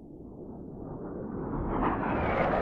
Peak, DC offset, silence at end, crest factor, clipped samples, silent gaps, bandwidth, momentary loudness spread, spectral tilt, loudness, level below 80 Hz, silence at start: -14 dBFS; under 0.1%; 0 s; 16 dB; under 0.1%; none; 6.6 kHz; 16 LU; -9.5 dB/octave; -32 LUFS; -42 dBFS; 0 s